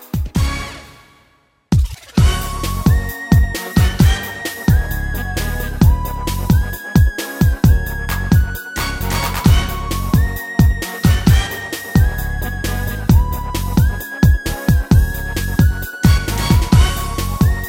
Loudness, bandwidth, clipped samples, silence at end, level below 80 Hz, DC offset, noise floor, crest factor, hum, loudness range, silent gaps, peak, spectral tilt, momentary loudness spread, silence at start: -17 LUFS; 17 kHz; under 0.1%; 0 s; -20 dBFS; under 0.1%; -56 dBFS; 14 dB; none; 2 LU; none; 0 dBFS; -5.5 dB/octave; 8 LU; 0 s